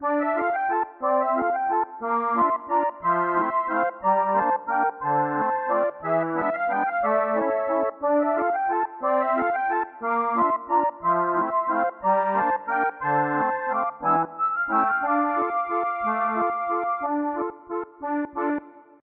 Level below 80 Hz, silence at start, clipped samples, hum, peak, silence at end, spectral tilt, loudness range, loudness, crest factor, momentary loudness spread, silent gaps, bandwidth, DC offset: -66 dBFS; 0 s; under 0.1%; none; -10 dBFS; 0.2 s; -6 dB/octave; 1 LU; -24 LUFS; 14 dB; 4 LU; none; 4.2 kHz; under 0.1%